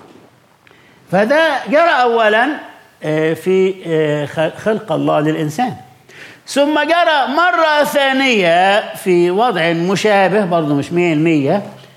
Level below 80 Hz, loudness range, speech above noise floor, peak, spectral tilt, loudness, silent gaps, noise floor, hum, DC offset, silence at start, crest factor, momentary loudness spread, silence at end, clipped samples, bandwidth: -66 dBFS; 4 LU; 35 dB; -2 dBFS; -5.5 dB/octave; -14 LUFS; none; -48 dBFS; none; under 0.1%; 1.1 s; 12 dB; 7 LU; 0.2 s; under 0.1%; 16 kHz